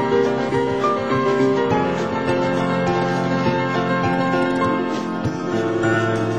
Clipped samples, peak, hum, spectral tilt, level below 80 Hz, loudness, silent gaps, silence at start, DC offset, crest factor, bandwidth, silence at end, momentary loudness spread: under 0.1%; -6 dBFS; none; -6.5 dB/octave; -48 dBFS; -20 LUFS; none; 0 s; 0.4%; 14 dB; 10 kHz; 0 s; 4 LU